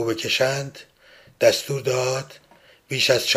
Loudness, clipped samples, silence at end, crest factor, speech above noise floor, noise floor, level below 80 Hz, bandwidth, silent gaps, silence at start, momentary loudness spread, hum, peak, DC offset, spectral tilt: -22 LUFS; under 0.1%; 0 s; 20 dB; 30 dB; -52 dBFS; -64 dBFS; 16 kHz; none; 0 s; 10 LU; none; -4 dBFS; under 0.1%; -3 dB/octave